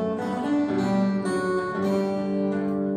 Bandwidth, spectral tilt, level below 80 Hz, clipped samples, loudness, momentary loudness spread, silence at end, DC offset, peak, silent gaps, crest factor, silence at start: 9.8 kHz; -7.5 dB/octave; -62 dBFS; under 0.1%; -25 LUFS; 3 LU; 0 s; under 0.1%; -12 dBFS; none; 12 dB; 0 s